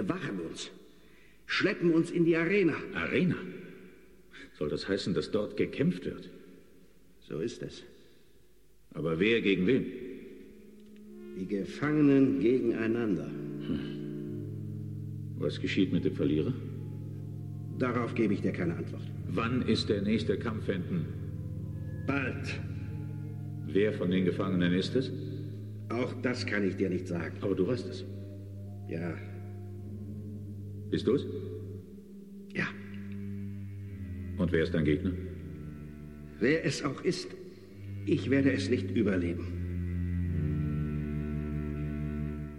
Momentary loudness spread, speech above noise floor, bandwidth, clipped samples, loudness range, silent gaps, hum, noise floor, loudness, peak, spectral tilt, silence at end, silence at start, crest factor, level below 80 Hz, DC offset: 16 LU; 34 dB; 12 kHz; under 0.1%; 7 LU; none; none; -64 dBFS; -32 LUFS; -14 dBFS; -7 dB/octave; 0 s; 0 s; 18 dB; -52 dBFS; 0.1%